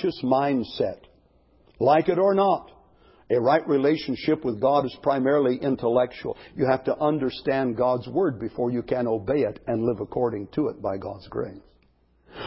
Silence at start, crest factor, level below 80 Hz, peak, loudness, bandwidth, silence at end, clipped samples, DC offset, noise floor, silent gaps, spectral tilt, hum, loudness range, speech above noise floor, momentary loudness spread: 0 s; 18 dB; -56 dBFS; -6 dBFS; -24 LUFS; 5.8 kHz; 0 s; under 0.1%; under 0.1%; -62 dBFS; none; -11 dB/octave; none; 4 LU; 39 dB; 9 LU